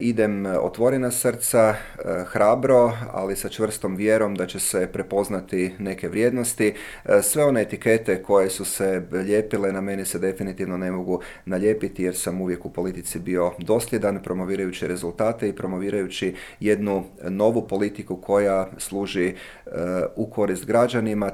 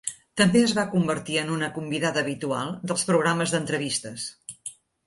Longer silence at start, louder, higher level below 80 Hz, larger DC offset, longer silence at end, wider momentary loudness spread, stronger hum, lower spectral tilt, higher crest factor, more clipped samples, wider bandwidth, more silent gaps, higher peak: about the same, 0 s vs 0.05 s; about the same, -23 LUFS vs -25 LUFS; first, -50 dBFS vs -62 dBFS; neither; second, 0 s vs 0.35 s; second, 9 LU vs 14 LU; neither; about the same, -5 dB/octave vs -4 dB/octave; about the same, 18 dB vs 20 dB; neither; first, 17 kHz vs 11.5 kHz; neither; about the same, -4 dBFS vs -6 dBFS